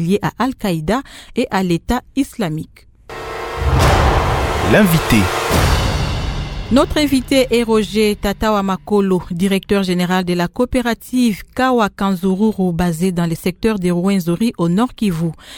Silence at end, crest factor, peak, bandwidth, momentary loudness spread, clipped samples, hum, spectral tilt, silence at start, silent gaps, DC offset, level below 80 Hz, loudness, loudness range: 0 s; 16 dB; 0 dBFS; 19 kHz; 8 LU; under 0.1%; none; -6 dB/octave; 0 s; none; under 0.1%; -28 dBFS; -16 LUFS; 3 LU